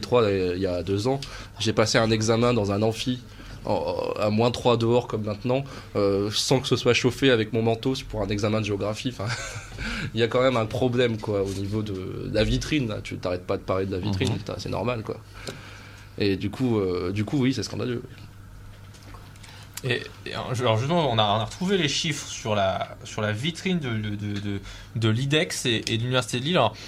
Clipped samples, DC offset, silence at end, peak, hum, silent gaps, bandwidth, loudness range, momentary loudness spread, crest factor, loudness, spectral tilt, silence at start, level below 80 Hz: under 0.1%; under 0.1%; 0 s; -6 dBFS; none; none; 15 kHz; 5 LU; 14 LU; 20 dB; -25 LUFS; -5 dB/octave; 0 s; -46 dBFS